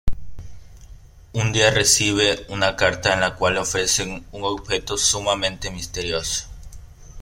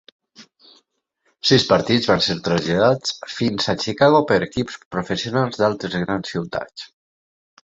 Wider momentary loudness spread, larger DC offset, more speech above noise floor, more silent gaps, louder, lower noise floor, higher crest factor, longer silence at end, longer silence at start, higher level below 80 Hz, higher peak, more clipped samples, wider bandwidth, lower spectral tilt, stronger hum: about the same, 14 LU vs 12 LU; neither; second, 22 dB vs 49 dB; second, none vs 4.85-4.91 s; about the same, -20 LUFS vs -19 LUFS; second, -43 dBFS vs -68 dBFS; about the same, 20 dB vs 20 dB; second, 0 s vs 0.8 s; second, 0.05 s vs 0.4 s; first, -36 dBFS vs -52 dBFS; about the same, -2 dBFS vs -2 dBFS; neither; first, 16.5 kHz vs 8 kHz; second, -2.5 dB/octave vs -5 dB/octave; neither